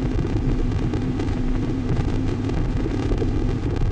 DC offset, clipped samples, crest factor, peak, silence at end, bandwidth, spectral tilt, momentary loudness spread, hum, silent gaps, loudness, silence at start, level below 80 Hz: under 0.1%; under 0.1%; 12 dB; -10 dBFS; 0 s; 8.6 kHz; -8 dB/octave; 1 LU; none; none; -24 LUFS; 0 s; -26 dBFS